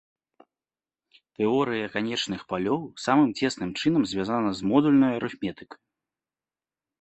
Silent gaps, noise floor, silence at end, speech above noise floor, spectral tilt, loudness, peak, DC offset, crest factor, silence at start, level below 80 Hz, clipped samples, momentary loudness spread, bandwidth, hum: none; under -90 dBFS; 1.35 s; over 65 dB; -5.5 dB/octave; -25 LUFS; -8 dBFS; under 0.1%; 20 dB; 1.4 s; -62 dBFS; under 0.1%; 9 LU; 8.4 kHz; none